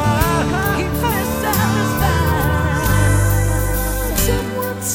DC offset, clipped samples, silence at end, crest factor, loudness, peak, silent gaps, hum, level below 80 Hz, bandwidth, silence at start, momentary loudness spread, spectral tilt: under 0.1%; under 0.1%; 0 s; 16 dB; -17 LUFS; 0 dBFS; none; none; -24 dBFS; 19 kHz; 0 s; 4 LU; -5 dB/octave